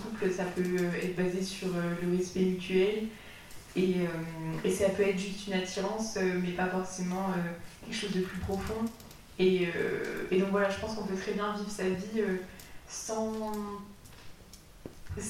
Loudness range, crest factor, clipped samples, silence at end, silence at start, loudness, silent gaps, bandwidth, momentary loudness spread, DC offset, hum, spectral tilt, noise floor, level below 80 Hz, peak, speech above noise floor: 4 LU; 16 dB; under 0.1%; 0 s; 0 s; -32 LUFS; none; 16 kHz; 17 LU; 0.1%; none; -5.5 dB/octave; -53 dBFS; -54 dBFS; -16 dBFS; 21 dB